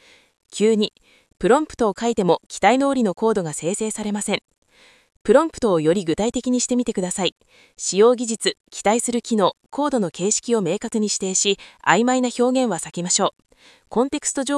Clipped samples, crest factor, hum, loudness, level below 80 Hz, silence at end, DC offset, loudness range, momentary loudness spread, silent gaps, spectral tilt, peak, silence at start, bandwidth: under 0.1%; 20 dB; none; -20 LUFS; -54 dBFS; 0 s; under 0.1%; 2 LU; 8 LU; 2.46-2.50 s, 4.58-4.62 s, 5.21-5.25 s, 7.32-7.36 s, 8.60-8.64 s; -3.5 dB/octave; 0 dBFS; 0.55 s; 12 kHz